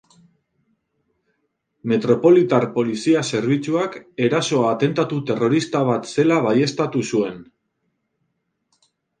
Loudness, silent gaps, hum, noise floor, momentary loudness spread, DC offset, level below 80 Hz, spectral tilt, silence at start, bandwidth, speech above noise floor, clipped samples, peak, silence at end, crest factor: -19 LUFS; none; none; -73 dBFS; 8 LU; under 0.1%; -64 dBFS; -6 dB/octave; 1.85 s; 9.6 kHz; 54 dB; under 0.1%; -2 dBFS; 1.75 s; 18 dB